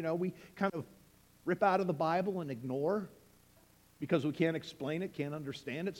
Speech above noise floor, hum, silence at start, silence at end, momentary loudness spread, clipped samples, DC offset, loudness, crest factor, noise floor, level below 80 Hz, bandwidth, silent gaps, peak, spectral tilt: 30 dB; none; 0 s; 0 s; 11 LU; under 0.1%; under 0.1%; -35 LUFS; 20 dB; -65 dBFS; -72 dBFS; 17 kHz; none; -16 dBFS; -7 dB/octave